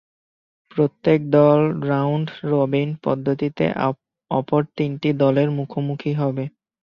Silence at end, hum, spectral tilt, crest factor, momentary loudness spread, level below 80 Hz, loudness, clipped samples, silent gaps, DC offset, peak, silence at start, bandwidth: 0.35 s; none; -10 dB/octave; 18 dB; 9 LU; -60 dBFS; -21 LUFS; under 0.1%; none; under 0.1%; -4 dBFS; 0.75 s; 5.8 kHz